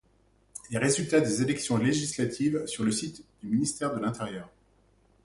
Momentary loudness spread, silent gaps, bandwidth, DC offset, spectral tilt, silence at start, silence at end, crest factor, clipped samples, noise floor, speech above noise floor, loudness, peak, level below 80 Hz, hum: 15 LU; none; 11.5 kHz; under 0.1%; -4.5 dB/octave; 0.55 s; 0.75 s; 18 dB; under 0.1%; -65 dBFS; 37 dB; -28 LUFS; -10 dBFS; -62 dBFS; none